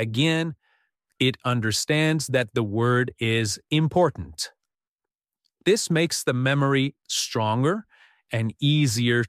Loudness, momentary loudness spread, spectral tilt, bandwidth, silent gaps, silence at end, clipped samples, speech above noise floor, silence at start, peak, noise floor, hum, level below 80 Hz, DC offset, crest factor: -24 LUFS; 7 LU; -4.5 dB/octave; 15 kHz; 4.88-4.96 s; 0 s; under 0.1%; over 67 dB; 0 s; -8 dBFS; under -90 dBFS; none; -58 dBFS; under 0.1%; 16 dB